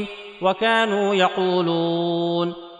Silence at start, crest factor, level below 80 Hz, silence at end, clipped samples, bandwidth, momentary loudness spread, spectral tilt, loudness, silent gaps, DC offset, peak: 0 s; 16 dB; -64 dBFS; 0 s; under 0.1%; 10 kHz; 6 LU; -6 dB/octave; -21 LUFS; none; under 0.1%; -6 dBFS